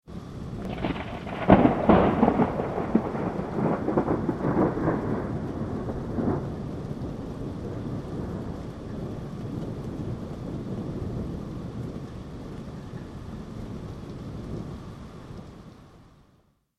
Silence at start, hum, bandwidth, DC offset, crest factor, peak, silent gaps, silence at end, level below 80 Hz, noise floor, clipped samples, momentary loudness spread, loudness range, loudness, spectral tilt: 0.05 s; none; 11.5 kHz; under 0.1%; 26 dB; -2 dBFS; none; 0.75 s; -44 dBFS; -64 dBFS; under 0.1%; 18 LU; 15 LU; -28 LUFS; -8.5 dB/octave